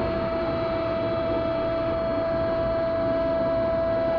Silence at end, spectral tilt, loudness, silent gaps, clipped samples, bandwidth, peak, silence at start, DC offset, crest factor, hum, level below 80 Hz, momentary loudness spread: 0 s; -9 dB/octave; -25 LUFS; none; under 0.1%; 5.4 kHz; -14 dBFS; 0 s; under 0.1%; 10 dB; none; -42 dBFS; 2 LU